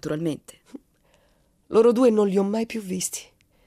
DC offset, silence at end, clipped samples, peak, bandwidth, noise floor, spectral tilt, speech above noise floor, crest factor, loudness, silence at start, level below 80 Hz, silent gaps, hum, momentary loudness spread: under 0.1%; 0.45 s; under 0.1%; -8 dBFS; 15 kHz; -63 dBFS; -5.5 dB/octave; 41 dB; 16 dB; -22 LUFS; 0.05 s; -64 dBFS; none; none; 12 LU